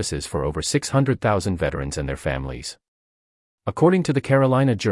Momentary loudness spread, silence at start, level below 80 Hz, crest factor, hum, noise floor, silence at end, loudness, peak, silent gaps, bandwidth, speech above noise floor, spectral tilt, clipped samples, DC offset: 13 LU; 0 s; -40 dBFS; 18 dB; none; under -90 dBFS; 0 s; -22 LUFS; -4 dBFS; 2.88-3.58 s; 12 kHz; over 69 dB; -5.5 dB/octave; under 0.1%; under 0.1%